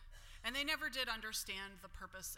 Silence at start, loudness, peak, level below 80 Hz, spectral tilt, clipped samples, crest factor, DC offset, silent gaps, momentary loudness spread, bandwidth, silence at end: 0 s; -41 LUFS; -24 dBFS; -58 dBFS; -1 dB/octave; under 0.1%; 20 dB; under 0.1%; none; 15 LU; 16.5 kHz; 0 s